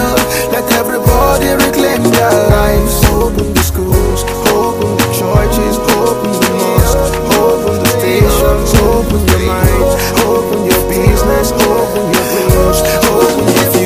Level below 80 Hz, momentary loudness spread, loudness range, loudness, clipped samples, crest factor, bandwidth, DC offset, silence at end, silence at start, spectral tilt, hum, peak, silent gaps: -18 dBFS; 3 LU; 1 LU; -11 LUFS; 0.4%; 10 dB; 16 kHz; under 0.1%; 0 s; 0 s; -5 dB/octave; none; 0 dBFS; none